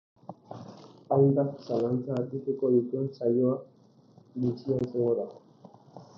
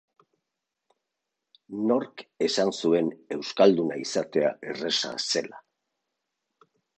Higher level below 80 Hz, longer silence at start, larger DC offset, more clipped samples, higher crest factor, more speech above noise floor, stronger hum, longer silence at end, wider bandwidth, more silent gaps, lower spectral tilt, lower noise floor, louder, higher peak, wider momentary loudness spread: about the same, -70 dBFS vs -74 dBFS; second, 0.3 s vs 1.7 s; neither; neither; about the same, 18 dB vs 22 dB; second, 30 dB vs 59 dB; neither; second, 0.15 s vs 1.4 s; second, 6.4 kHz vs 9.6 kHz; neither; first, -10.5 dB/octave vs -4 dB/octave; second, -58 dBFS vs -85 dBFS; about the same, -28 LUFS vs -26 LUFS; second, -10 dBFS vs -6 dBFS; first, 21 LU vs 12 LU